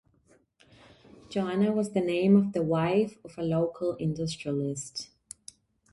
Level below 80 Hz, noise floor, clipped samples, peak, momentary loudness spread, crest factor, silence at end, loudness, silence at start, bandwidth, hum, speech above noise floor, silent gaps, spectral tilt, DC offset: -64 dBFS; -65 dBFS; under 0.1%; -10 dBFS; 16 LU; 18 dB; 0.9 s; -28 LUFS; 1.3 s; 11.5 kHz; none; 38 dB; none; -6.5 dB/octave; under 0.1%